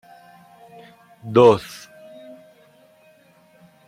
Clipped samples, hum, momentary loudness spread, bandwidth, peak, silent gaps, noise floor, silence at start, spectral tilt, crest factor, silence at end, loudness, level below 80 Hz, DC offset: under 0.1%; none; 29 LU; 15 kHz; -2 dBFS; none; -54 dBFS; 1.25 s; -6.5 dB/octave; 22 dB; 2.3 s; -16 LUFS; -64 dBFS; under 0.1%